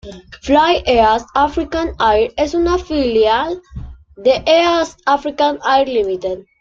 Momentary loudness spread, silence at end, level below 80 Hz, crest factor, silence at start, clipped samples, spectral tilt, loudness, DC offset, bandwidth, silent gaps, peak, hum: 11 LU; 0.2 s; -36 dBFS; 14 dB; 0.05 s; under 0.1%; -4.5 dB/octave; -15 LUFS; under 0.1%; 7.6 kHz; none; -2 dBFS; none